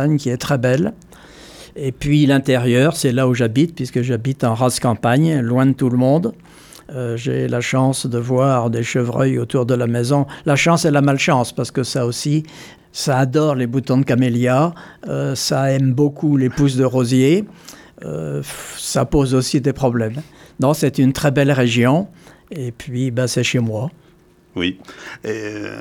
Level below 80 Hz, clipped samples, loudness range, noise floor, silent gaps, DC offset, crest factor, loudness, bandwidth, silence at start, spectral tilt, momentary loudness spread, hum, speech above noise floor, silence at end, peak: -44 dBFS; under 0.1%; 3 LU; -51 dBFS; none; under 0.1%; 14 dB; -17 LUFS; 16.5 kHz; 0 s; -6 dB/octave; 12 LU; none; 34 dB; 0 s; -2 dBFS